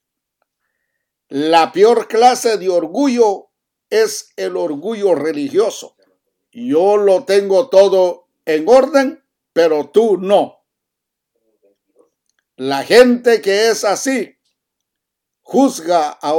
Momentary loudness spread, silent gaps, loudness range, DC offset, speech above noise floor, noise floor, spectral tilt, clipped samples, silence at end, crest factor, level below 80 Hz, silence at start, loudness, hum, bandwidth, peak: 11 LU; none; 5 LU; under 0.1%; 66 dB; -79 dBFS; -3.5 dB/octave; under 0.1%; 0 s; 16 dB; -62 dBFS; 1.3 s; -14 LUFS; none; 17 kHz; 0 dBFS